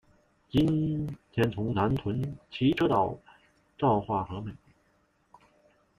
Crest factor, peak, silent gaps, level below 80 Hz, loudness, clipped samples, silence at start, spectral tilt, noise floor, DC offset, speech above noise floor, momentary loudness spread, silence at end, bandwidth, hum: 18 dB; -12 dBFS; none; -54 dBFS; -29 LUFS; under 0.1%; 0.55 s; -8.5 dB/octave; -69 dBFS; under 0.1%; 41 dB; 11 LU; 1.4 s; 15 kHz; none